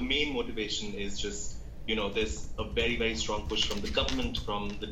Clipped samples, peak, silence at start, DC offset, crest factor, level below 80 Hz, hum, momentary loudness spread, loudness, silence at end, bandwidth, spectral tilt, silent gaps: under 0.1%; -14 dBFS; 0 s; under 0.1%; 18 dB; -40 dBFS; none; 8 LU; -32 LUFS; 0 s; 16 kHz; -3.5 dB/octave; none